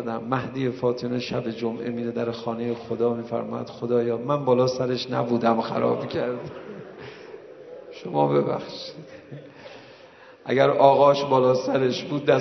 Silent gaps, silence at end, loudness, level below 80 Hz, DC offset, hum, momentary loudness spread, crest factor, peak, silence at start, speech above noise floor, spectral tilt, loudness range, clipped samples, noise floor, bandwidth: none; 0 s; -24 LUFS; -66 dBFS; under 0.1%; none; 22 LU; 22 dB; -2 dBFS; 0 s; 25 dB; -6.5 dB/octave; 8 LU; under 0.1%; -48 dBFS; 6.2 kHz